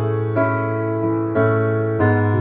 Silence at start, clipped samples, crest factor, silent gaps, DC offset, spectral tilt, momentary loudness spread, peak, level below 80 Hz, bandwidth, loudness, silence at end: 0 s; under 0.1%; 12 dB; none; under 0.1%; -9 dB/octave; 4 LU; -6 dBFS; -52 dBFS; 3.8 kHz; -19 LUFS; 0 s